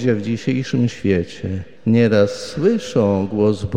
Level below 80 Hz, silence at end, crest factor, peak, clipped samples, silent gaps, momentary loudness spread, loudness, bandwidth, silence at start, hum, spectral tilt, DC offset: -48 dBFS; 0 s; 16 dB; -2 dBFS; under 0.1%; none; 8 LU; -19 LUFS; 10 kHz; 0 s; none; -7 dB/octave; 0.9%